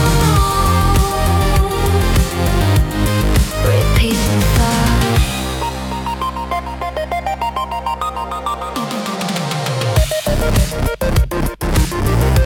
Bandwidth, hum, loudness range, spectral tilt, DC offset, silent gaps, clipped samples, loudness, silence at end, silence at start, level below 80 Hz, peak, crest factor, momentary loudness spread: 18 kHz; none; 6 LU; -5 dB/octave; under 0.1%; none; under 0.1%; -16 LUFS; 0 s; 0 s; -20 dBFS; -2 dBFS; 14 dB; 8 LU